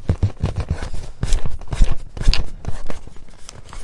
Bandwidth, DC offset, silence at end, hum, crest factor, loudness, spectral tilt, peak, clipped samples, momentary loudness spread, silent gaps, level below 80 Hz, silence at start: 11 kHz; under 0.1%; 0 s; none; 16 dB; -25 LUFS; -5 dB/octave; 0 dBFS; under 0.1%; 17 LU; none; -22 dBFS; 0 s